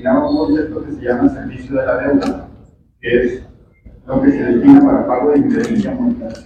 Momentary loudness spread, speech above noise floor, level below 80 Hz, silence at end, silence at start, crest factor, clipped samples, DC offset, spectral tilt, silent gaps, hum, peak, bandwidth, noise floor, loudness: 14 LU; 31 dB; -38 dBFS; 0.05 s; 0 s; 14 dB; 0.5%; under 0.1%; -8 dB/octave; none; none; 0 dBFS; 7.2 kHz; -44 dBFS; -14 LUFS